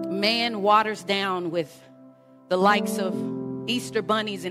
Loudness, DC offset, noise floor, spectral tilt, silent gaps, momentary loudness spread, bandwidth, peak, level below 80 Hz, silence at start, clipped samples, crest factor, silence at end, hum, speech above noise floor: -24 LUFS; under 0.1%; -51 dBFS; -4.5 dB/octave; none; 10 LU; 16 kHz; -6 dBFS; -70 dBFS; 0 s; under 0.1%; 18 dB; 0 s; none; 27 dB